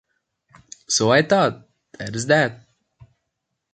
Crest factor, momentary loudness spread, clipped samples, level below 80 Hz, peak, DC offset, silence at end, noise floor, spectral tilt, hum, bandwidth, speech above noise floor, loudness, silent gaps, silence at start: 20 dB; 13 LU; under 0.1%; -60 dBFS; -2 dBFS; under 0.1%; 1.15 s; -79 dBFS; -3.5 dB/octave; none; 9.4 kHz; 60 dB; -19 LUFS; none; 0.9 s